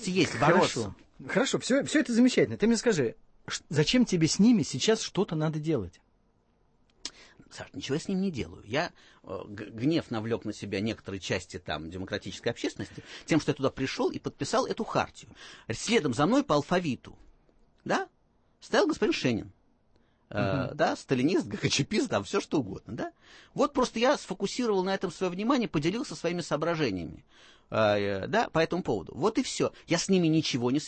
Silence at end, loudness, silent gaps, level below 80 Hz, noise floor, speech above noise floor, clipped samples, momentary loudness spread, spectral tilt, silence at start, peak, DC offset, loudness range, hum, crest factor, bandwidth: 0 s; -29 LUFS; none; -58 dBFS; -68 dBFS; 39 dB; under 0.1%; 15 LU; -5 dB/octave; 0 s; -8 dBFS; under 0.1%; 7 LU; none; 20 dB; 8.8 kHz